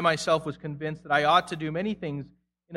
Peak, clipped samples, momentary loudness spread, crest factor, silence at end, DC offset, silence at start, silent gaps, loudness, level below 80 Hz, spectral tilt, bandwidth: -6 dBFS; under 0.1%; 14 LU; 20 dB; 0 s; under 0.1%; 0 s; none; -27 LUFS; -62 dBFS; -5 dB/octave; 12.5 kHz